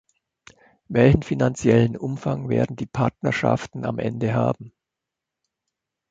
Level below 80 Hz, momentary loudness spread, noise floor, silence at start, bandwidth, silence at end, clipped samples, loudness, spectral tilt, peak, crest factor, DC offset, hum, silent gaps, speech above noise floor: -44 dBFS; 9 LU; -85 dBFS; 0.9 s; 8 kHz; 1.4 s; under 0.1%; -22 LUFS; -7.5 dB/octave; -2 dBFS; 20 dB; under 0.1%; none; none; 64 dB